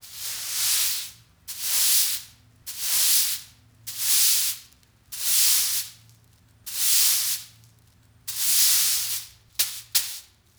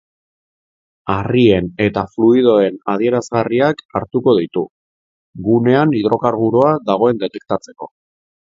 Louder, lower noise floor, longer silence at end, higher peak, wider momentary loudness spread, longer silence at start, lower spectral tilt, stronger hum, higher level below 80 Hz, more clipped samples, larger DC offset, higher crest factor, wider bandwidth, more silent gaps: second, -21 LUFS vs -15 LUFS; second, -57 dBFS vs under -90 dBFS; second, 0.35 s vs 0.65 s; second, -6 dBFS vs 0 dBFS; first, 20 LU vs 11 LU; second, 0.05 s vs 1.05 s; second, 3.5 dB/octave vs -7.5 dB/octave; neither; second, -64 dBFS vs -48 dBFS; neither; neither; about the same, 20 dB vs 16 dB; first, over 20 kHz vs 7.6 kHz; second, none vs 3.85-3.89 s, 4.71-5.33 s